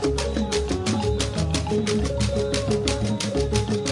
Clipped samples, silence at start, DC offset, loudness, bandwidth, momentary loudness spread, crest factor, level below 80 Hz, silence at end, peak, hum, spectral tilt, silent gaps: under 0.1%; 0 s; under 0.1%; -24 LUFS; 11.5 kHz; 1 LU; 16 dB; -32 dBFS; 0 s; -6 dBFS; none; -5 dB/octave; none